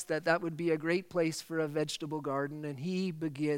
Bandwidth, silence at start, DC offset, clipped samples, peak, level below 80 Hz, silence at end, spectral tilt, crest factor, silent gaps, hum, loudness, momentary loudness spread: 16.5 kHz; 0 s; under 0.1%; under 0.1%; -14 dBFS; -76 dBFS; 0 s; -5.5 dB/octave; 20 dB; none; none; -34 LUFS; 6 LU